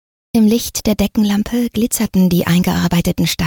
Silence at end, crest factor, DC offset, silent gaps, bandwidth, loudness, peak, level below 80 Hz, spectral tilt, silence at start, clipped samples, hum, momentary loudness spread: 0 s; 12 dB; under 0.1%; none; 19 kHz; -15 LUFS; -4 dBFS; -36 dBFS; -5.5 dB/octave; 0.35 s; under 0.1%; none; 4 LU